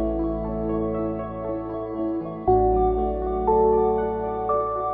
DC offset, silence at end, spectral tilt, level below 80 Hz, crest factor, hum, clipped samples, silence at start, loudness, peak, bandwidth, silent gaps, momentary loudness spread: under 0.1%; 0 s; -12.5 dB/octave; -36 dBFS; 14 dB; none; under 0.1%; 0 s; -24 LUFS; -8 dBFS; 3.8 kHz; none; 10 LU